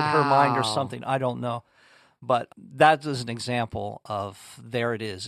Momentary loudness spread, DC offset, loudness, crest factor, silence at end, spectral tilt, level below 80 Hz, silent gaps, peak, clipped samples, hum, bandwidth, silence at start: 15 LU; under 0.1%; -25 LUFS; 22 dB; 0 s; -5 dB/octave; -64 dBFS; none; -4 dBFS; under 0.1%; none; 13.5 kHz; 0 s